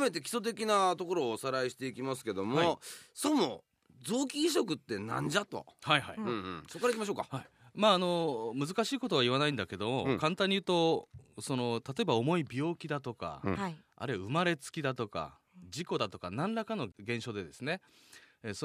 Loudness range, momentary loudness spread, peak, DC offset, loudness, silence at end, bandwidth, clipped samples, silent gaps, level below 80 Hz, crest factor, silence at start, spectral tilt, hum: 5 LU; 12 LU; -10 dBFS; under 0.1%; -33 LUFS; 0 s; 15.5 kHz; under 0.1%; none; -70 dBFS; 24 dB; 0 s; -4.5 dB/octave; none